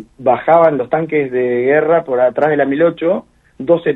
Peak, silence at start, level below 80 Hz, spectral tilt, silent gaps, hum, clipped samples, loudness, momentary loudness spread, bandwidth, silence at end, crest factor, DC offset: 0 dBFS; 0 s; -56 dBFS; -9 dB/octave; none; none; under 0.1%; -14 LUFS; 7 LU; 4 kHz; 0 s; 14 dB; under 0.1%